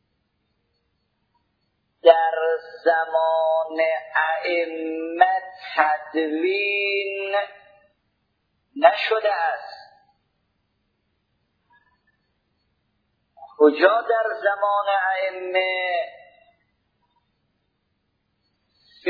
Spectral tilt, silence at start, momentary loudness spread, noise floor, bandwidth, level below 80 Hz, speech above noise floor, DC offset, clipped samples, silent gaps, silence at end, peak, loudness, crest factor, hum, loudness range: -4.5 dB/octave; 2.05 s; 10 LU; -73 dBFS; 5 kHz; -78 dBFS; 51 dB; under 0.1%; under 0.1%; none; 0 s; 0 dBFS; -21 LUFS; 24 dB; none; 7 LU